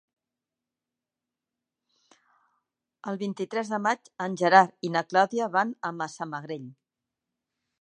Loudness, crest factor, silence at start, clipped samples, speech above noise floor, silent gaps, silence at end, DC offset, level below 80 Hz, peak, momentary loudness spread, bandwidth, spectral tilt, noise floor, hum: -26 LUFS; 26 dB; 3.05 s; under 0.1%; 63 dB; none; 1.1 s; under 0.1%; -84 dBFS; -2 dBFS; 17 LU; 9.8 kHz; -5 dB/octave; -89 dBFS; none